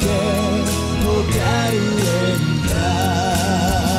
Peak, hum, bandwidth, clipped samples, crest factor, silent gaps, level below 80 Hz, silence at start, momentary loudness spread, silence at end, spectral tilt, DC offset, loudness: -6 dBFS; none; 16 kHz; under 0.1%; 12 dB; none; -30 dBFS; 0 s; 1 LU; 0 s; -5 dB/octave; under 0.1%; -18 LUFS